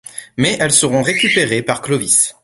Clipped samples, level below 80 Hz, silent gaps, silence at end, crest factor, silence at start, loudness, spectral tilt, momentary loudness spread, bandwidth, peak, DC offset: under 0.1%; -50 dBFS; none; 0.15 s; 16 dB; 0.15 s; -14 LUFS; -2.5 dB/octave; 6 LU; 12 kHz; 0 dBFS; under 0.1%